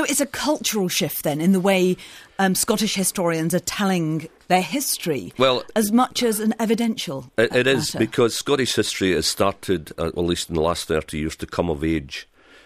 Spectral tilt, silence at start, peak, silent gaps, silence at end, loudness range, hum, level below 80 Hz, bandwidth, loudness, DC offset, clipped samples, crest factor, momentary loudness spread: -4 dB/octave; 0 s; -2 dBFS; none; 0.45 s; 2 LU; none; -46 dBFS; 15.5 kHz; -21 LUFS; under 0.1%; under 0.1%; 18 dB; 8 LU